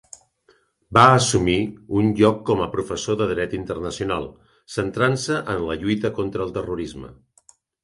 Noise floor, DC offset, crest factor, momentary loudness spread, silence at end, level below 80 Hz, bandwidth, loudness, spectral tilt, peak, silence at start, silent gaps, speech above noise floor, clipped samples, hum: -61 dBFS; under 0.1%; 22 dB; 13 LU; 0.7 s; -46 dBFS; 11.5 kHz; -21 LUFS; -5 dB/octave; 0 dBFS; 0.9 s; none; 40 dB; under 0.1%; none